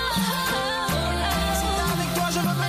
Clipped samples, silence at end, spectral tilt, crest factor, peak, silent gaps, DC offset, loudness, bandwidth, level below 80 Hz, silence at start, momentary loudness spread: under 0.1%; 0 s; -4 dB/octave; 12 dB; -12 dBFS; none; under 0.1%; -24 LUFS; 15.5 kHz; -34 dBFS; 0 s; 1 LU